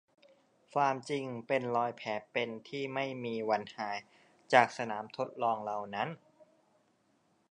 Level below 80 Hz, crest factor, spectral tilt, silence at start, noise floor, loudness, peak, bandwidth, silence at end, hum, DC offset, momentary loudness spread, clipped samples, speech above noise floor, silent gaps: -84 dBFS; 28 dB; -5 dB/octave; 0.75 s; -73 dBFS; -34 LUFS; -8 dBFS; 10 kHz; 1.35 s; none; under 0.1%; 12 LU; under 0.1%; 39 dB; none